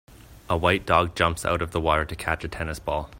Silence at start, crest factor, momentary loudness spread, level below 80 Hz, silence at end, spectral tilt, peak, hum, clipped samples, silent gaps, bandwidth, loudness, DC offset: 0.1 s; 22 dB; 8 LU; -42 dBFS; 0 s; -5 dB/octave; -2 dBFS; none; under 0.1%; none; 16.5 kHz; -24 LUFS; under 0.1%